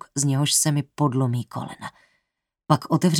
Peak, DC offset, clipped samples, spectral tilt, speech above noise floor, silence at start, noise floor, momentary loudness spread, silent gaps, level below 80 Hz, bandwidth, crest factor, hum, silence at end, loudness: -2 dBFS; under 0.1%; under 0.1%; -4.5 dB/octave; 57 dB; 0.15 s; -79 dBFS; 16 LU; none; -66 dBFS; 17.5 kHz; 22 dB; none; 0 s; -22 LUFS